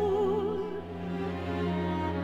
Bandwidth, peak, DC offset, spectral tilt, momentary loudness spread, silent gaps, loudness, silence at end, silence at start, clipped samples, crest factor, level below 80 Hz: 8 kHz; -18 dBFS; under 0.1%; -8 dB/octave; 9 LU; none; -32 LUFS; 0 s; 0 s; under 0.1%; 12 dB; -52 dBFS